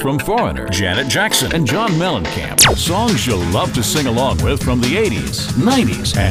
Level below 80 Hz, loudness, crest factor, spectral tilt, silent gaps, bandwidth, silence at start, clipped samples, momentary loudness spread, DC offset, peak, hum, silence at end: -30 dBFS; -15 LUFS; 16 dB; -4 dB/octave; none; 16 kHz; 0 s; under 0.1%; 7 LU; under 0.1%; 0 dBFS; none; 0 s